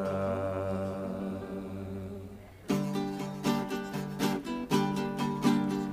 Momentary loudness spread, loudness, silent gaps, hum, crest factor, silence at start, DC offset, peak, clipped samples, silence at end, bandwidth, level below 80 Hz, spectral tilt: 11 LU; -33 LUFS; none; none; 20 dB; 0 s; under 0.1%; -14 dBFS; under 0.1%; 0 s; 15.5 kHz; -58 dBFS; -6 dB/octave